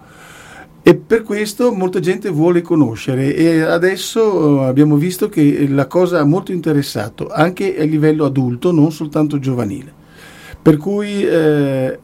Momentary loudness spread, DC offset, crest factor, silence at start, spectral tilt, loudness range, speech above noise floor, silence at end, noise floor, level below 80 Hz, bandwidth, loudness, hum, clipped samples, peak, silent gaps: 5 LU; under 0.1%; 14 dB; 0.2 s; -7 dB/octave; 3 LU; 25 dB; 0.05 s; -39 dBFS; -48 dBFS; 16 kHz; -15 LUFS; none; 0.1%; 0 dBFS; none